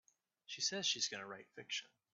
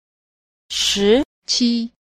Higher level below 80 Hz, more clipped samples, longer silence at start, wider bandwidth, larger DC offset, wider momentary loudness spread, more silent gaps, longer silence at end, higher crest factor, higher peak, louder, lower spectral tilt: second, under -90 dBFS vs -48 dBFS; neither; second, 0.5 s vs 0.7 s; second, 8.6 kHz vs 15.5 kHz; neither; first, 15 LU vs 8 LU; second, none vs 1.25-1.42 s; about the same, 0.3 s vs 0.3 s; about the same, 22 dB vs 18 dB; second, -24 dBFS vs -4 dBFS; second, -40 LUFS vs -18 LUFS; second, -0.5 dB/octave vs -3 dB/octave